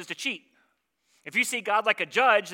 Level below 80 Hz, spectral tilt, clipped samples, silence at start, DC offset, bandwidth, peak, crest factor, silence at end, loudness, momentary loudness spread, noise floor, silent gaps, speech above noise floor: -90 dBFS; -1.5 dB/octave; under 0.1%; 0 s; under 0.1%; 17 kHz; -8 dBFS; 20 dB; 0 s; -25 LUFS; 13 LU; -72 dBFS; none; 46 dB